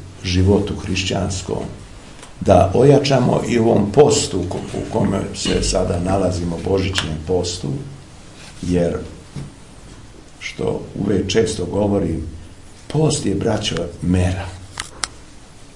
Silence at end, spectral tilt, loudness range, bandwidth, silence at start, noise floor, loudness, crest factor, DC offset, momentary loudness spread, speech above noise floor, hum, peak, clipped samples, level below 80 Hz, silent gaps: 0 s; -5.5 dB/octave; 9 LU; 11.5 kHz; 0 s; -40 dBFS; -18 LUFS; 18 dB; 0.4%; 20 LU; 23 dB; none; 0 dBFS; under 0.1%; -38 dBFS; none